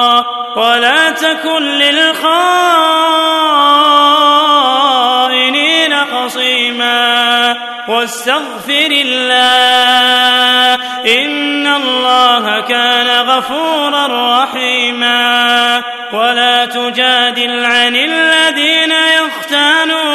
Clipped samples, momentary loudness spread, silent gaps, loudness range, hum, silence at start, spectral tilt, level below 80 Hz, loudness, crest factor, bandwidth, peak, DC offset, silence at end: 0.3%; 6 LU; none; 2 LU; none; 0 s; -0.5 dB/octave; -62 dBFS; -9 LUFS; 10 dB; 13.5 kHz; 0 dBFS; under 0.1%; 0 s